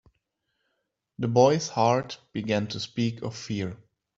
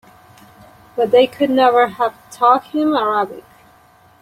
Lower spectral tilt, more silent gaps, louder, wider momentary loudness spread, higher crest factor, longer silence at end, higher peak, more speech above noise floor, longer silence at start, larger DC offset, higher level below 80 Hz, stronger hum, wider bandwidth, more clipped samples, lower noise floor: about the same, -5.5 dB/octave vs -5 dB/octave; neither; second, -26 LUFS vs -16 LUFS; first, 14 LU vs 9 LU; first, 22 dB vs 16 dB; second, 0.4 s vs 0.8 s; second, -6 dBFS vs -2 dBFS; first, 54 dB vs 34 dB; first, 1.2 s vs 0.95 s; neither; about the same, -64 dBFS vs -62 dBFS; neither; second, 7.8 kHz vs 15.5 kHz; neither; first, -79 dBFS vs -50 dBFS